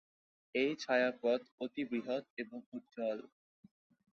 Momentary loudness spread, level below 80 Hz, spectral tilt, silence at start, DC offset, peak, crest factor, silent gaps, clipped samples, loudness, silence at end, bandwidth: 13 LU; -84 dBFS; -2.5 dB/octave; 0.55 s; under 0.1%; -18 dBFS; 20 dB; 1.51-1.58 s, 2.30-2.37 s, 2.66-2.72 s; under 0.1%; -37 LUFS; 0.85 s; 7.6 kHz